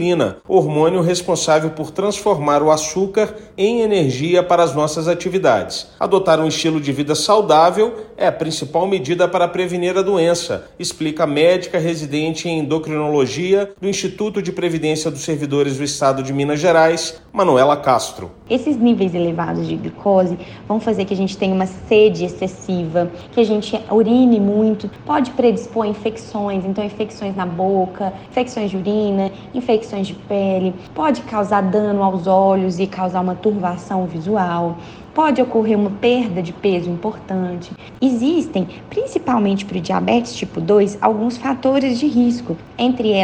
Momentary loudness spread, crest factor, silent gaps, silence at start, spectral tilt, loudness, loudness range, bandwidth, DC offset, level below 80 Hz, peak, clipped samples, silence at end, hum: 9 LU; 16 dB; none; 0 s; -5.5 dB/octave; -18 LUFS; 4 LU; 16.5 kHz; under 0.1%; -50 dBFS; 0 dBFS; under 0.1%; 0 s; none